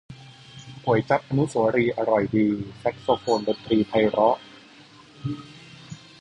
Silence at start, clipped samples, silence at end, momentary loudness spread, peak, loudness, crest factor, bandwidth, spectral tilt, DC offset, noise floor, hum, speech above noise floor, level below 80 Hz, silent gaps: 0.1 s; under 0.1%; 0.25 s; 22 LU; -6 dBFS; -23 LUFS; 20 dB; 10.5 kHz; -7 dB/octave; under 0.1%; -49 dBFS; none; 27 dB; -56 dBFS; none